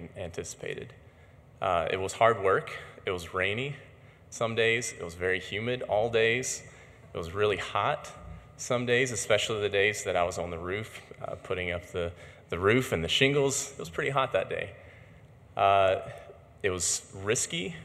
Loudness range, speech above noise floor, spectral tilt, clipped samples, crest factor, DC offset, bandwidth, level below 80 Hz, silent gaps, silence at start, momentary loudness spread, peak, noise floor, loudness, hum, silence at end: 2 LU; 26 dB; -3.5 dB/octave; under 0.1%; 24 dB; under 0.1%; 15.5 kHz; -58 dBFS; none; 0 s; 16 LU; -6 dBFS; -55 dBFS; -29 LUFS; none; 0 s